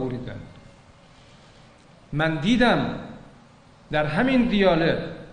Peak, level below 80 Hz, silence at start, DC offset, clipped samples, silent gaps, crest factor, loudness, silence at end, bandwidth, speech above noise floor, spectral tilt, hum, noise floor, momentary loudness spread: -6 dBFS; -44 dBFS; 0 s; under 0.1%; under 0.1%; none; 18 dB; -22 LUFS; 0 s; 9.8 kHz; 30 dB; -6.5 dB/octave; none; -51 dBFS; 17 LU